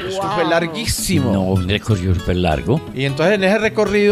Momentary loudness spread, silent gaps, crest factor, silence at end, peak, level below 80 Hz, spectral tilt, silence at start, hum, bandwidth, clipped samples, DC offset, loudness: 4 LU; none; 14 dB; 0 s; -2 dBFS; -36 dBFS; -5.5 dB/octave; 0 s; none; 16 kHz; under 0.1%; under 0.1%; -17 LUFS